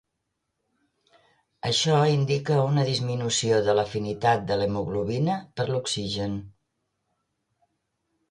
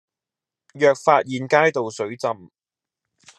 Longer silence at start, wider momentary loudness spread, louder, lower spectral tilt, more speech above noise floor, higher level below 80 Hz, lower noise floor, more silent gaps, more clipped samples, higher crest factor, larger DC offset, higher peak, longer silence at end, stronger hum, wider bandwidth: first, 1.65 s vs 0.75 s; about the same, 8 LU vs 10 LU; second, -25 LUFS vs -20 LUFS; about the same, -5 dB/octave vs -5 dB/octave; second, 55 dB vs 69 dB; first, -56 dBFS vs -76 dBFS; second, -80 dBFS vs -88 dBFS; neither; neither; about the same, 18 dB vs 22 dB; neither; second, -10 dBFS vs -2 dBFS; first, 1.8 s vs 1 s; neither; about the same, 11 kHz vs 11.5 kHz